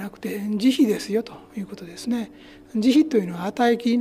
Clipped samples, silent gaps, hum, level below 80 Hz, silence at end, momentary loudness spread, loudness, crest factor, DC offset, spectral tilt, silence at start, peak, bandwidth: under 0.1%; none; none; -62 dBFS; 0 s; 16 LU; -22 LUFS; 14 dB; under 0.1%; -5.5 dB/octave; 0 s; -8 dBFS; 15.5 kHz